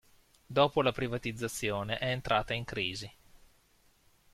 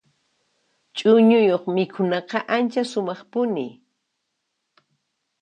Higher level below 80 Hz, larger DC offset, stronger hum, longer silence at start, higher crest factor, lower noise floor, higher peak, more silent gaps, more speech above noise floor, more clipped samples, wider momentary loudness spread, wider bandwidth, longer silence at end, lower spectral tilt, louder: first, -56 dBFS vs -76 dBFS; neither; neither; second, 0.5 s vs 0.95 s; about the same, 22 dB vs 18 dB; second, -67 dBFS vs -77 dBFS; second, -12 dBFS vs -6 dBFS; neither; second, 35 dB vs 57 dB; neither; second, 8 LU vs 12 LU; first, 15.5 kHz vs 9.2 kHz; second, 1.25 s vs 1.7 s; second, -4.5 dB/octave vs -6.5 dB/octave; second, -32 LUFS vs -21 LUFS